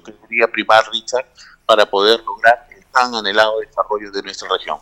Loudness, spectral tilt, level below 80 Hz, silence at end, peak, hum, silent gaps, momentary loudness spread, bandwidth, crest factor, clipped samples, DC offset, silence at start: -16 LUFS; -2 dB/octave; -56 dBFS; 0.05 s; 0 dBFS; none; none; 10 LU; 16 kHz; 16 dB; under 0.1%; under 0.1%; 0.05 s